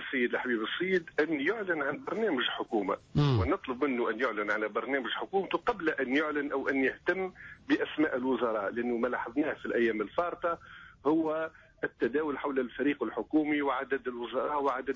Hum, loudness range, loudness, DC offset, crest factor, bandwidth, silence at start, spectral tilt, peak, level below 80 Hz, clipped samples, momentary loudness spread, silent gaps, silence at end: none; 2 LU; -31 LUFS; under 0.1%; 14 dB; 7.4 kHz; 0 s; -7.5 dB/octave; -18 dBFS; -56 dBFS; under 0.1%; 5 LU; none; 0 s